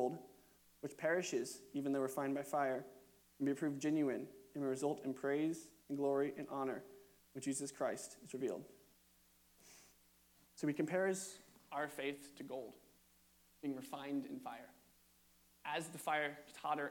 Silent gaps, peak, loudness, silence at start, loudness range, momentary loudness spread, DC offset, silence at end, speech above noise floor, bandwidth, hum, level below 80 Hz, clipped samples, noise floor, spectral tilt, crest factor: none; -24 dBFS; -42 LUFS; 0 s; 7 LU; 16 LU; under 0.1%; 0 s; 30 dB; 19 kHz; none; -82 dBFS; under 0.1%; -71 dBFS; -4.5 dB/octave; 18 dB